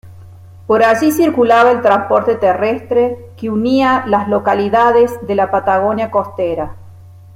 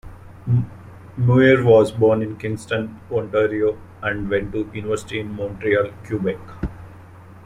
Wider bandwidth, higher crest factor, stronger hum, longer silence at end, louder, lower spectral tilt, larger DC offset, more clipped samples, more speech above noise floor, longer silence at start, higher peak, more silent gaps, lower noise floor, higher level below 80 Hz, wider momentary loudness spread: first, 16.5 kHz vs 10.5 kHz; second, 12 dB vs 18 dB; neither; about the same, 0.25 s vs 0.15 s; first, -13 LUFS vs -20 LUFS; second, -6 dB/octave vs -7.5 dB/octave; neither; neither; about the same, 24 dB vs 23 dB; about the same, 0.05 s vs 0.05 s; about the same, 0 dBFS vs -2 dBFS; neither; second, -37 dBFS vs -42 dBFS; second, -50 dBFS vs -44 dBFS; second, 9 LU vs 16 LU